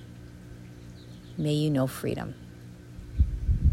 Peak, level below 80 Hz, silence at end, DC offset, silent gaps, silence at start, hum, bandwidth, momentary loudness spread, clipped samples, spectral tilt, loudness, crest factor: -12 dBFS; -34 dBFS; 0 s; under 0.1%; none; 0 s; none; 15.5 kHz; 20 LU; under 0.1%; -7 dB/octave; -29 LUFS; 18 dB